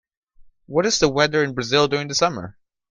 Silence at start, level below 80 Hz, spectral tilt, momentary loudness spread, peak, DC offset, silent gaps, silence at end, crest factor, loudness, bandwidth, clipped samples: 0.4 s; -50 dBFS; -3.5 dB/octave; 7 LU; -2 dBFS; under 0.1%; none; 0.4 s; 20 dB; -20 LUFS; 10 kHz; under 0.1%